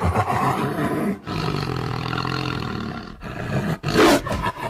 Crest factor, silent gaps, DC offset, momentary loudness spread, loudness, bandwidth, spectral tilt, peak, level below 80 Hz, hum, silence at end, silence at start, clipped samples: 16 dB; none; under 0.1%; 13 LU; -23 LUFS; 16 kHz; -5.5 dB/octave; -6 dBFS; -40 dBFS; none; 0 s; 0 s; under 0.1%